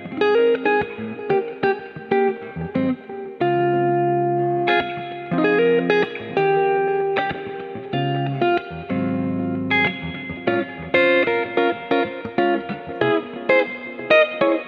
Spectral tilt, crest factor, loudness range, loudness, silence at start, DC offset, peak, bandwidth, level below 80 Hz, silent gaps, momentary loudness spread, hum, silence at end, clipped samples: -8 dB/octave; 18 dB; 3 LU; -21 LUFS; 0 s; under 0.1%; -2 dBFS; 6.2 kHz; -56 dBFS; none; 11 LU; none; 0 s; under 0.1%